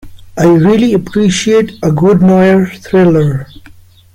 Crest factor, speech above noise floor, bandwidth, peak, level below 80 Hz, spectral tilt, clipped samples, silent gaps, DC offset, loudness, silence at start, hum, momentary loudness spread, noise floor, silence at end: 8 dB; 29 dB; 12 kHz; 0 dBFS; -40 dBFS; -6.5 dB/octave; under 0.1%; none; under 0.1%; -9 LUFS; 0.05 s; none; 6 LU; -38 dBFS; 0.45 s